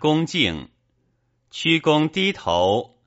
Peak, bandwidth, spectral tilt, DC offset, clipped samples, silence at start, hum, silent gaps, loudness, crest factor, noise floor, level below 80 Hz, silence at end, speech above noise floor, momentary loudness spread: -4 dBFS; 8 kHz; -3.5 dB/octave; under 0.1%; under 0.1%; 0 s; none; none; -20 LUFS; 18 dB; -68 dBFS; -52 dBFS; 0.2 s; 47 dB; 7 LU